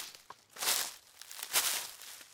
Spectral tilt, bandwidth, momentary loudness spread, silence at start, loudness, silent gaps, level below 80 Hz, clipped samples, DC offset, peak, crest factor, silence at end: 2.5 dB/octave; 18 kHz; 21 LU; 0 s; -33 LUFS; none; -82 dBFS; under 0.1%; under 0.1%; -12 dBFS; 26 dB; 0 s